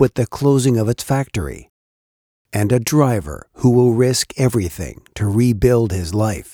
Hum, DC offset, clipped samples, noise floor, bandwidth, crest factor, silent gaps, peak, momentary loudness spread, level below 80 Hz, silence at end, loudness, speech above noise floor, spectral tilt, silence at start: none; under 0.1%; under 0.1%; under -90 dBFS; 19.5 kHz; 16 dB; 1.69-2.45 s; -2 dBFS; 12 LU; -38 dBFS; 0.05 s; -17 LUFS; over 73 dB; -6 dB/octave; 0 s